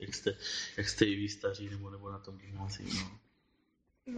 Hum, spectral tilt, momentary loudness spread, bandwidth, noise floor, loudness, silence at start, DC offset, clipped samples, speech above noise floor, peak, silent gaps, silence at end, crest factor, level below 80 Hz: none; -4 dB/octave; 15 LU; 9.6 kHz; -76 dBFS; -37 LUFS; 0 s; under 0.1%; under 0.1%; 39 dB; -12 dBFS; none; 0 s; 26 dB; -60 dBFS